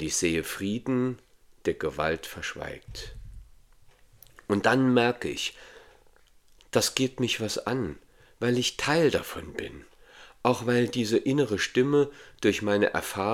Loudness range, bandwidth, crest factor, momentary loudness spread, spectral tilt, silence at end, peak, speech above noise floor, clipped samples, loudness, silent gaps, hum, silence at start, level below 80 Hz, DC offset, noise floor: 6 LU; 17 kHz; 24 dB; 14 LU; -4.5 dB/octave; 0 s; -4 dBFS; 31 dB; under 0.1%; -27 LUFS; none; none; 0 s; -54 dBFS; under 0.1%; -58 dBFS